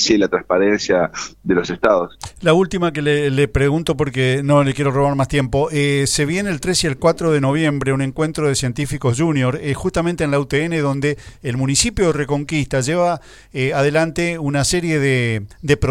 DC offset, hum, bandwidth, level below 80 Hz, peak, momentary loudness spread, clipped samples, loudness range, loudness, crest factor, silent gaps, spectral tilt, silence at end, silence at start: under 0.1%; none; 14.5 kHz; -38 dBFS; 0 dBFS; 5 LU; under 0.1%; 2 LU; -18 LUFS; 18 dB; none; -5 dB/octave; 0 s; 0 s